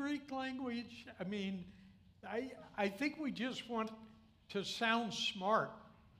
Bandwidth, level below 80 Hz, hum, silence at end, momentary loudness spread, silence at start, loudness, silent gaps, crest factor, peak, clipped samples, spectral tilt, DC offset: 15.5 kHz; -74 dBFS; none; 0.1 s; 13 LU; 0 s; -40 LUFS; none; 22 dB; -18 dBFS; under 0.1%; -4.5 dB/octave; under 0.1%